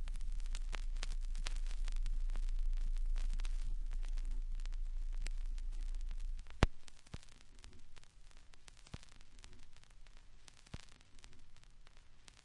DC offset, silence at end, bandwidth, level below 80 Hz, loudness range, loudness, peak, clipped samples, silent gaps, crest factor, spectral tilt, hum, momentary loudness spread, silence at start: under 0.1%; 0.05 s; 10.5 kHz; -40 dBFS; 16 LU; -46 LUFS; -10 dBFS; under 0.1%; none; 30 dB; -5 dB/octave; none; 20 LU; 0 s